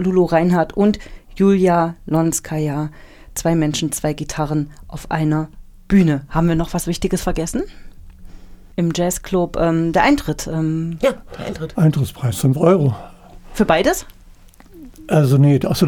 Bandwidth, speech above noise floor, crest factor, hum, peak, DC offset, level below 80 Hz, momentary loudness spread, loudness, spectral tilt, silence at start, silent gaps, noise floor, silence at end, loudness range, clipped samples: 19 kHz; 27 dB; 16 dB; none; -2 dBFS; under 0.1%; -36 dBFS; 12 LU; -18 LUFS; -6 dB/octave; 0 s; none; -44 dBFS; 0 s; 4 LU; under 0.1%